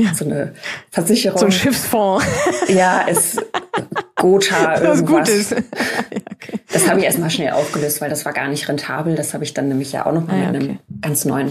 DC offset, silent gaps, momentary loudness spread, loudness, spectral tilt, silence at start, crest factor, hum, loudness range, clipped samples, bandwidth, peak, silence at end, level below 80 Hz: under 0.1%; none; 9 LU; -17 LUFS; -4 dB/octave; 0 s; 16 dB; none; 5 LU; under 0.1%; 15.5 kHz; 0 dBFS; 0 s; -54 dBFS